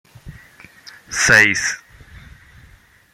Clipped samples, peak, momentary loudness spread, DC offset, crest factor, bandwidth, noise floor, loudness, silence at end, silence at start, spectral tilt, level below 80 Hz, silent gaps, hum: under 0.1%; 0 dBFS; 16 LU; under 0.1%; 22 dB; 16.5 kHz; -49 dBFS; -14 LUFS; 1.35 s; 0.25 s; -1.5 dB/octave; -48 dBFS; none; none